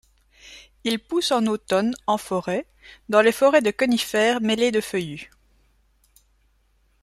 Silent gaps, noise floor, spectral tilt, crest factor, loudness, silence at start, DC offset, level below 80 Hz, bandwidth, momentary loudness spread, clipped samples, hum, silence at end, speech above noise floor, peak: none; -63 dBFS; -4 dB/octave; 20 dB; -22 LUFS; 0.45 s; under 0.1%; -60 dBFS; 15 kHz; 11 LU; under 0.1%; none; 1.8 s; 42 dB; -4 dBFS